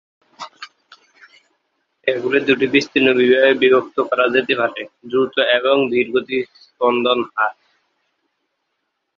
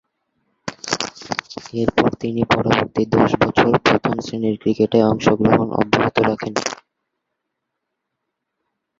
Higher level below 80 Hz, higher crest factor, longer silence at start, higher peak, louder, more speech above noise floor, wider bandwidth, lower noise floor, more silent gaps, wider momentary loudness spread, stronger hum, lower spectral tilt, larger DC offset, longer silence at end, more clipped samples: second, -62 dBFS vs -48 dBFS; about the same, 18 dB vs 20 dB; second, 0.4 s vs 0.65 s; about the same, -2 dBFS vs 0 dBFS; about the same, -17 LUFS vs -18 LUFS; second, 57 dB vs 61 dB; second, 7 kHz vs 8 kHz; second, -74 dBFS vs -78 dBFS; neither; first, 19 LU vs 12 LU; neither; about the same, -5 dB/octave vs -5.5 dB/octave; neither; second, 1.65 s vs 2.25 s; neither